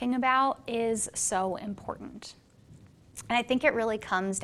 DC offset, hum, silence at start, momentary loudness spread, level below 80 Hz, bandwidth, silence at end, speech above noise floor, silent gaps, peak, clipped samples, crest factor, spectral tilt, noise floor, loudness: under 0.1%; none; 0 s; 20 LU; -60 dBFS; 14 kHz; 0 s; 25 dB; none; -10 dBFS; under 0.1%; 20 dB; -3 dB/octave; -55 dBFS; -28 LUFS